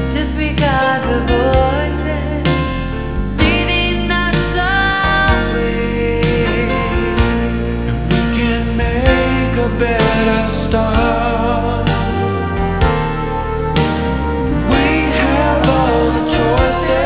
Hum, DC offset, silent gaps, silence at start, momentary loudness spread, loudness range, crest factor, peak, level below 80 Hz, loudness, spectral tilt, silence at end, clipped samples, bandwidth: none; 1%; none; 0 s; 5 LU; 2 LU; 14 dB; 0 dBFS; -22 dBFS; -15 LUFS; -10.5 dB/octave; 0 s; under 0.1%; 4 kHz